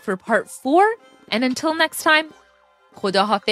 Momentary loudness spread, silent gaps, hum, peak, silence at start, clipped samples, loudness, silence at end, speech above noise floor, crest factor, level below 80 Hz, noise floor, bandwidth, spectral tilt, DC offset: 9 LU; none; none; -2 dBFS; 0.05 s; under 0.1%; -19 LUFS; 0 s; 36 dB; 18 dB; -72 dBFS; -56 dBFS; 16 kHz; -3.5 dB/octave; under 0.1%